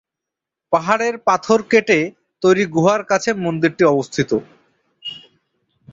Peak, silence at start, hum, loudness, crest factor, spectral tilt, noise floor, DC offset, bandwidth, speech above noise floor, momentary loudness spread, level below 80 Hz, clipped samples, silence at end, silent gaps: -2 dBFS; 0.7 s; none; -17 LUFS; 18 dB; -5 dB/octave; -84 dBFS; under 0.1%; 7.8 kHz; 68 dB; 15 LU; -58 dBFS; under 0.1%; 0.75 s; none